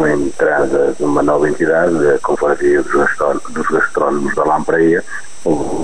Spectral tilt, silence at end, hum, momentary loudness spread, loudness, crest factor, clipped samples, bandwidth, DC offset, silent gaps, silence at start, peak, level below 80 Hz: -6 dB/octave; 0 s; none; 5 LU; -14 LUFS; 12 dB; under 0.1%; 10.5 kHz; 6%; none; 0 s; -2 dBFS; -40 dBFS